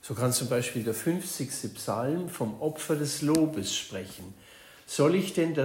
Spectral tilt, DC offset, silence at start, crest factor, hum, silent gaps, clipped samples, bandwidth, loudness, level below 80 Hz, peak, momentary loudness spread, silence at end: -4.5 dB/octave; under 0.1%; 0.05 s; 24 dB; none; none; under 0.1%; 16.5 kHz; -29 LUFS; -66 dBFS; -6 dBFS; 13 LU; 0 s